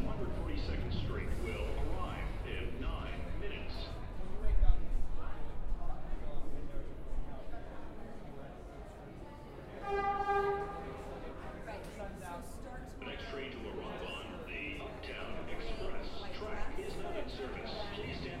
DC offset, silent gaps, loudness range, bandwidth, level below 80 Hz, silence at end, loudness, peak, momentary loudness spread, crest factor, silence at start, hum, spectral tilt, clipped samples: under 0.1%; none; 8 LU; 10.5 kHz; -40 dBFS; 0 s; -42 LUFS; -12 dBFS; 13 LU; 22 dB; 0 s; none; -6 dB/octave; under 0.1%